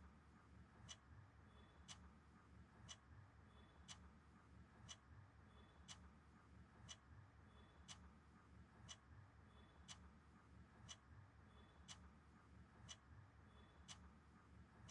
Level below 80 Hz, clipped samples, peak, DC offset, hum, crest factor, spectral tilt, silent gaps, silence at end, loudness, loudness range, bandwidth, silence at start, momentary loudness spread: -72 dBFS; under 0.1%; -44 dBFS; under 0.1%; none; 22 dB; -3 dB/octave; none; 0 s; -65 LUFS; 0 LU; 10.5 kHz; 0 s; 7 LU